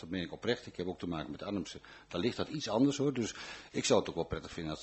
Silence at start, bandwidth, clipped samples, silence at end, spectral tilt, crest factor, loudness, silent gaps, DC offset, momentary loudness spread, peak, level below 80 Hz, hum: 0 s; 8.2 kHz; under 0.1%; 0 s; -4.5 dB/octave; 22 dB; -35 LUFS; none; under 0.1%; 11 LU; -14 dBFS; -60 dBFS; none